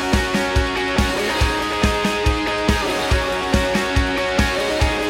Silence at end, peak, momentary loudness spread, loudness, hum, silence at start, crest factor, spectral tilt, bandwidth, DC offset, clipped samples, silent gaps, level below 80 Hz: 0 s; -4 dBFS; 1 LU; -19 LUFS; none; 0 s; 16 dB; -4.5 dB/octave; 16.5 kHz; under 0.1%; under 0.1%; none; -26 dBFS